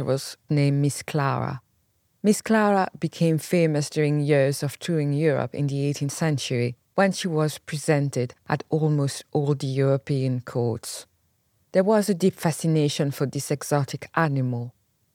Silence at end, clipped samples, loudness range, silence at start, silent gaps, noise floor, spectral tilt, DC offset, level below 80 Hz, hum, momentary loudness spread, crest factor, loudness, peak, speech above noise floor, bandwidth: 0.45 s; under 0.1%; 2 LU; 0 s; none; -68 dBFS; -6 dB/octave; under 0.1%; -70 dBFS; none; 7 LU; 18 dB; -24 LUFS; -6 dBFS; 45 dB; 16.5 kHz